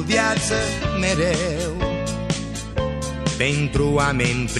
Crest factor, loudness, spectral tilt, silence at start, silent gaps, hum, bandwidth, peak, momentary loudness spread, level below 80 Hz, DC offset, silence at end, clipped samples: 18 dB; -22 LUFS; -4.5 dB/octave; 0 s; none; none; 13.5 kHz; -4 dBFS; 7 LU; -32 dBFS; under 0.1%; 0 s; under 0.1%